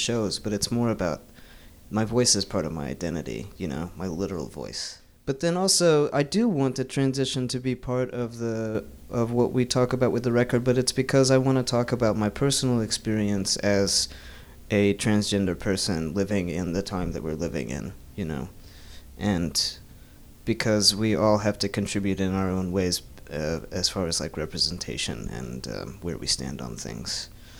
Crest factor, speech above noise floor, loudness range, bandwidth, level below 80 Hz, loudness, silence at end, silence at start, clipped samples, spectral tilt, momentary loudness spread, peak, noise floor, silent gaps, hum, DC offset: 20 dB; 22 dB; 6 LU; over 20 kHz; -46 dBFS; -26 LUFS; 0 s; 0 s; under 0.1%; -4.5 dB/octave; 13 LU; -6 dBFS; -48 dBFS; none; none; under 0.1%